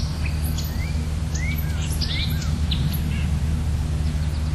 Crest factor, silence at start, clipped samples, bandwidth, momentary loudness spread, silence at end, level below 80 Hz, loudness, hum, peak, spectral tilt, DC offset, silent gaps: 12 dB; 0 s; under 0.1%; 13.5 kHz; 3 LU; 0 s; -26 dBFS; -25 LUFS; none; -10 dBFS; -5.5 dB/octave; under 0.1%; none